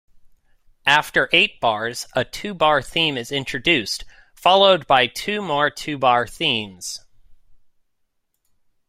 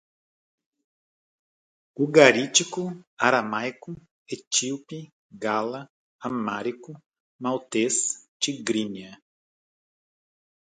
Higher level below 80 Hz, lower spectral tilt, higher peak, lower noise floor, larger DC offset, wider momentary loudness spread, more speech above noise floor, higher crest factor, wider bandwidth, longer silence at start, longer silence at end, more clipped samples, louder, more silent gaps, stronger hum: first, -52 dBFS vs -72 dBFS; about the same, -3 dB/octave vs -2.5 dB/octave; about the same, 0 dBFS vs 0 dBFS; second, -70 dBFS vs under -90 dBFS; neither; second, 12 LU vs 22 LU; second, 50 dB vs over 65 dB; second, 20 dB vs 26 dB; first, 16 kHz vs 9.6 kHz; second, 0.85 s vs 2 s; about the same, 1.35 s vs 1.45 s; neither; first, -19 LUFS vs -24 LUFS; second, none vs 3.07-3.17 s, 4.11-4.26 s, 4.47-4.51 s, 5.12-5.29 s, 5.90-6.19 s, 7.06-7.10 s, 7.20-7.39 s, 8.28-8.40 s; neither